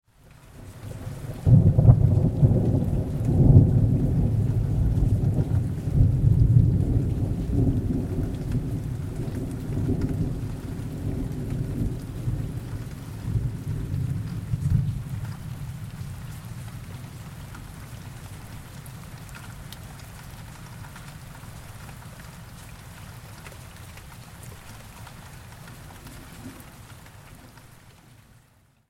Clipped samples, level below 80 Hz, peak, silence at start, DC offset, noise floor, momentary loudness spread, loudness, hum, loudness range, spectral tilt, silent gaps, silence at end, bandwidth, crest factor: under 0.1%; -34 dBFS; -2 dBFS; 0.55 s; under 0.1%; -60 dBFS; 23 LU; -24 LUFS; none; 22 LU; -8.5 dB/octave; none; 1.4 s; 15.5 kHz; 24 dB